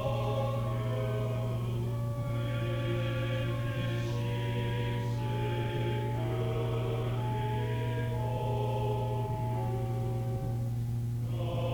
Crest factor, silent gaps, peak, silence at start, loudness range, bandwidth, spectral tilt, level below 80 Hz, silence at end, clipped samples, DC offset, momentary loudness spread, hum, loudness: 12 dB; none; -20 dBFS; 0 s; 1 LU; 18.5 kHz; -7.5 dB/octave; -48 dBFS; 0 s; under 0.1%; under 0.1%; 2 LU; none; -33 LUFS